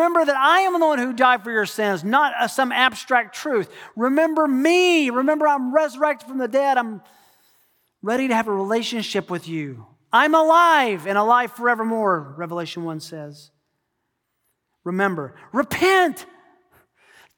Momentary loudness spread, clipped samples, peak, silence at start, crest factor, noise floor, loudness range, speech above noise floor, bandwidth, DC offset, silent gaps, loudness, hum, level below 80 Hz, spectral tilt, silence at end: 14 LU; under 0.1%; -2 dBFS; 0 s; 18 dB; -75 dBFS; 8 LU; 56 dB; 19.5 kHz; under 0.1%; none; -19 LUFS; none; -70 dBFS; -4 dB/octave; 1.15 s